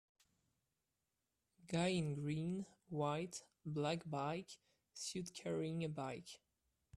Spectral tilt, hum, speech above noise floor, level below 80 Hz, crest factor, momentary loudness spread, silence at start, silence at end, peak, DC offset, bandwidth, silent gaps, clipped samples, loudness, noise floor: -5.5 dB/octave; none; 46 dB; -78 dBFS; 18 dB; 13 LU; 1.65 s; 0.6 s; -28 dBFS; under 0.1%; 13.5 kHz; none; under 0.1%; -44 LUFS; -89 dBFS